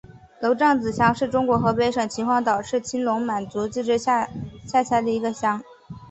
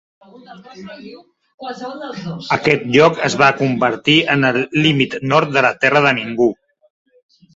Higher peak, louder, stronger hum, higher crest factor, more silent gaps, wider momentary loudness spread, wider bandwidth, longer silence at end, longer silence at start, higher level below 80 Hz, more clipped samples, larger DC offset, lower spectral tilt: second, -4 dBFS vs 0 dBFS; second, -22 LUFS vs -14 LUFS; neither; about the same, 18 dB vs 16 dB; second, none vs 1.54-1.58 s; second, 8 LU vs 21 LU; about the same, 8.4 kHz vs 8 kHz; second, 0 s vs 1.05 s; second, 0.1 s vs 0.5 s; about the same, -52 dBFS vs -56 dBFS; neither; neither; about the same, -5.5 dB/octave vs -5 dB/octave